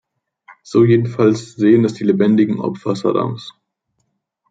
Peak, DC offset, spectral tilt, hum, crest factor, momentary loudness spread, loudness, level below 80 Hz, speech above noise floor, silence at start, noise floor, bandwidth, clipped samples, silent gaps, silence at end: -2 dBFS; under 0.1%; -8 dB/octave; none; 16 dB; 8 LU; -16 LUFS; -60 dBFS; 55 dB; 0.5 s; -70 dBFS; 7.8 kHz; under 0.1%; none; 1 s